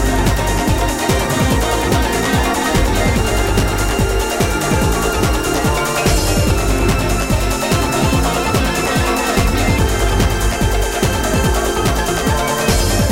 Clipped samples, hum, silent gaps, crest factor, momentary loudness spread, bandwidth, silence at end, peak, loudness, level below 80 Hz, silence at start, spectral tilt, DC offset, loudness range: under 0.1%; none; none; 14 dB; 2 LU; 16 kHz; 0 s; -2 dBFS; -16 LUFS; -20 dBFS; 0 s; -4.5 dB/octave; under 0.1%; 0 LU